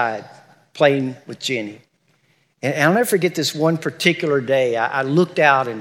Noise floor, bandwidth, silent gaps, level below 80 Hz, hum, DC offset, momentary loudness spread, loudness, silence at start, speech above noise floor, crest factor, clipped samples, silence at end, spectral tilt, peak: -62 dBFS; 18 kHz; none; -80 dBFS; none; under 0.1%; 11 LU; -18 LUFS; 0 s; 43 dB; 18 dB; under 0.1%; 0 s; -5 dB/octave; 0 dBFS